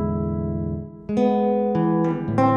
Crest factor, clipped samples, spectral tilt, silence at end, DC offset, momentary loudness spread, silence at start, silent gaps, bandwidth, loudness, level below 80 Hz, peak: 16 dB; under 0.1%; -9.5 dB/octave; 0 s; under 0.1%; 8 LU; 0 s; none; 7 kHz; -23 LUFS; -42 dBFS; -6 dBFS